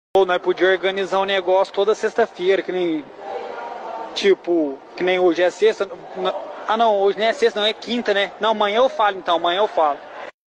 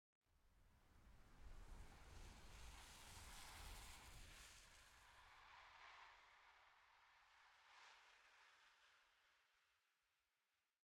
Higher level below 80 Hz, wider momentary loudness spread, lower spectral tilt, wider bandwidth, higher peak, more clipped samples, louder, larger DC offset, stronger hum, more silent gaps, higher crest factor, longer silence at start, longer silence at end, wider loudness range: first, -64 dBFS vs -70 dBFS; first, 12 LU vs 9 LU; first, -4 dB/octave vs -2.5 dB/octave; second, 9 kHz vs 17.5 kHz; first, -6 dBFS vs -44 dBFS; neither; first, -19 LUFS vs -64 LUFS; neither; neither; neither; second, 14 dB vs 22 dB; about the same, 0.15 s vs 0.25 s; second, 0.25 s vs 0.7 s; second, 3 LU vs 6 LU